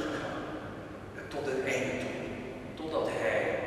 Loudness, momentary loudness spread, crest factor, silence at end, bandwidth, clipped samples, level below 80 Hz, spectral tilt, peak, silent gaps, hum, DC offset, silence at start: -35 LUFS; 12 LU; 16 dB; 0 s; 13.5 kHz; under 0.1%; -58 dBFS; -5 dB/octave; -18 dBFS; none; none; under 0.1%; 0 s